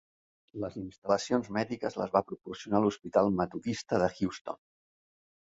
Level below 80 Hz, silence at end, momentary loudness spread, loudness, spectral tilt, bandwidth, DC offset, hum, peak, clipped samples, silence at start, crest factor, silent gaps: -62 dBFS; 1.05 s; 13 LU; -31 LUFS; -6 dB/octave; 8 kHz; under 0.1%; none; -10 dBFS; under 0.1%; 0.55 s; 22 dB; 0.98-1.02 s, 4.41-4.45 s